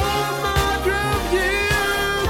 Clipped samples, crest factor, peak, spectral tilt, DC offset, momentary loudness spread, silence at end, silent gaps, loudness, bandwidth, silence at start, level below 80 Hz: under 0.1%; 14 dB; -6 dBFS; -4 dB/octave; 0.2%; 2 LU; 0 s; none; -20 LUFS; 17 kHz; 0 s; -30 dBFS